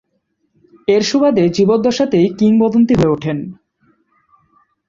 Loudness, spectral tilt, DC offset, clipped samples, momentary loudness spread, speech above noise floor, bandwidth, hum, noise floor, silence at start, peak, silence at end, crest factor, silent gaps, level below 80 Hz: -14 LUFS; -6.5 dB/octave; under 0.1%; under 0.1%; 10 LU; 54 dB; 7.6 kHz; none; -67 dBFS; 0.9 s; -2 dBFS; 1.35 s; 14 dB; none; -46 dBFS